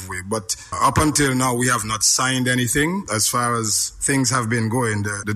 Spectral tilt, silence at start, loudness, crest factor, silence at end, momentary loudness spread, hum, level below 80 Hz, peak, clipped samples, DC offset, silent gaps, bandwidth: -3 dB/octave; 0 s; -19 LUFS; 16 dB; 0 s; 7 LU; none; -44 dBFS; -4 dBFS; under 0.1%; under 0.1%; none; 15.5 kHz